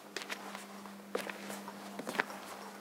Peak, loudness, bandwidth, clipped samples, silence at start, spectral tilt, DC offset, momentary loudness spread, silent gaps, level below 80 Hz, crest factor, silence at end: -8 dBFS; -42 LUFS; 17.5 kHz; under 0.1%; 0 s; -3 dB/octave; under 0.1%; 10 LU; none; -90 dBFS; 34 dB; 0 s